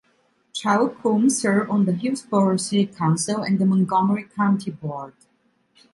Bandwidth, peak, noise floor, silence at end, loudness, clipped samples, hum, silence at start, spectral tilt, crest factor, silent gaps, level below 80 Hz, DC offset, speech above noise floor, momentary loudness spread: 11.5 kHz; -6 dBFS; -64 dBFS; 0.85 s; -21 LUFS; under 0.1%; none; 0.55 s; -5.5 dB/octave; 16 dB; none; -66 dBFS; under 0.1%; 43 dB; 12 LU